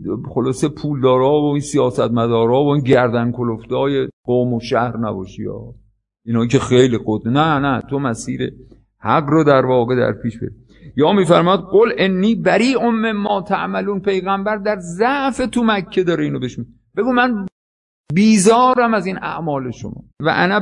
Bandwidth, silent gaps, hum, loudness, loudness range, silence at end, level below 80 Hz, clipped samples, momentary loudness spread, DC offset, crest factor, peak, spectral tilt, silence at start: 11 kHz; 4.13-4.24 s, 17.52-18.04 s; none; -16 LUFS; 3 LU; 0 s; -48 dBFS; under 0.1%; 12 LU; under 0.1%; 16 dB; 0 dBFS; -6 dB/octave; 0 s